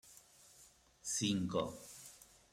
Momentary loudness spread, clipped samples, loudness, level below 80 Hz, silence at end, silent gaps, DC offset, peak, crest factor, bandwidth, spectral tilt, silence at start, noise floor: 24 LU; under 0.1%; -39 LUFS; -72 dBFS; 0.3 s; none; under 0.1%; -24 dBFS; 18 dB; 16 kHz; -4 dB/octave; 0.05 s; -65 dBFS